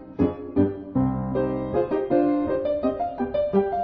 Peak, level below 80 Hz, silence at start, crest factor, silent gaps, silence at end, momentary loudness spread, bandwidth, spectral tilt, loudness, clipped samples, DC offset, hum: -8 dBFS; -44 dBFS; 0 s; 16 dB; none; 0 s; 4 LU; 5.2 kHz; -11 dB/octave; -24 LUFS; under 0.1%; under 0.1%; none